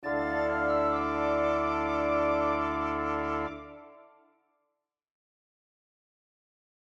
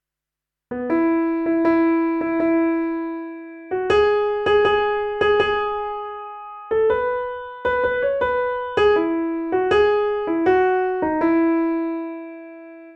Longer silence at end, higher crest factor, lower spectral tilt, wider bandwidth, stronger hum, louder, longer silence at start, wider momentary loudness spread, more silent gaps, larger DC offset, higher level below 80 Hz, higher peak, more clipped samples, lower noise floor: first, 2.85 s vs 0 s; about the same, 16 dB vs 14 dB; about the same, -7 dB/octave vs -6.5 dB/octave; about the same, 7.6 kHz vs 7.2 kHz; neither; second, -29 LUFS vs -20 LUFS; second, 0 s vs 0.7 s; second, 6 LU vs 14 LU; neither; neither; about the same, -52 dBFS vs -48 dBFS; second, -16 dBFS vs -6 dBFS; neither; about the same, -83 dBFS vs -86 dBFS